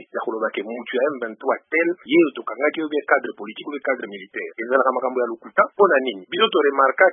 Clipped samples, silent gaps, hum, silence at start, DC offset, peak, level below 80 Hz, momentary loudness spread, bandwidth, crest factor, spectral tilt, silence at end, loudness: under 0.1%; none; none; 0 s; under 0.1%; -2 dBFS; -82 dBFS; 12 LU; 3.7 kHz; 20 dB; -9 dB/octave; 0 s; -21 LUFS